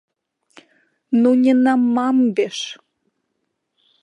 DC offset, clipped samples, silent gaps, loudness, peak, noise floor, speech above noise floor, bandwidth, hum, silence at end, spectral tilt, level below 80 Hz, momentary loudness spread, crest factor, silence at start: under 0.1%; under 0.1%; none; -17 LUFS; -4 dBFS; -74 dBFS; 58 dB; 9.4 kHz; none; 1.3 s; -5 dB/octave; -76 dBFS; 10 LU; 14 dB; 1.1 s